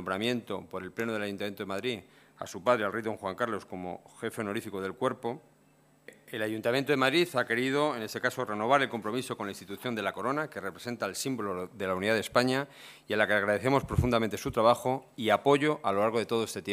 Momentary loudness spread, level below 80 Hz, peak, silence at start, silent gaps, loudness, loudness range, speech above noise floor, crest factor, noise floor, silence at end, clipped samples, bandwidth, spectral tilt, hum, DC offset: 13 LU; -54 dBFS; -8 dBFS; 0 s; none; -30 LUFS; 6 LU; 33 dB; 22 dB; -64 dBFS; 0 s; under 0.1%; 15.5 kHz; -5 dB/octave; none; under 0.1%